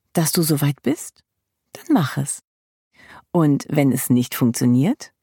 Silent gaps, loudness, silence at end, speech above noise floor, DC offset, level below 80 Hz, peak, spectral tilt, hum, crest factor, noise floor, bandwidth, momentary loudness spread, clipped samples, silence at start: 2.47-2.91 s; -20 LUFS; 0.15 s; 30 dB; under 0.1%; -64 dBFS; -2 dBFS; -5.5 dB/octave; none; 18 dB; -49 dBFS; 17.5 kHz; 9 LU; under 0.1%; 0.15 s